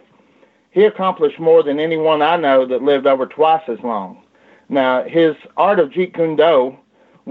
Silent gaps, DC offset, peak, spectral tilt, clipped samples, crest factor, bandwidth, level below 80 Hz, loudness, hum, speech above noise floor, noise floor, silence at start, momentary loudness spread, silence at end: none; under 0.1%; -2 dBFS; -8 dB/octave; under 0.1%; 14 dB; 4.5 kHz; -68 dBFS; -16 LUFS; none; 39 dB; -54 dBFS; 0.75 s; 9 LU; 0 s